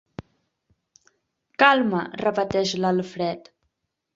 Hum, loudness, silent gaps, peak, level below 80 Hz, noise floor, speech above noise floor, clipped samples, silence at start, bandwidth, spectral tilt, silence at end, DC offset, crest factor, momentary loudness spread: none; -22 LUFS; none; -2 dBFS; -60 dBFS; -77 dBFS; 55 dB; under 0.1%; 1.6 s; 7.8 kHz; -5 dB/octave; 0.75 s; under 0.1%; 24 dB; 22 LU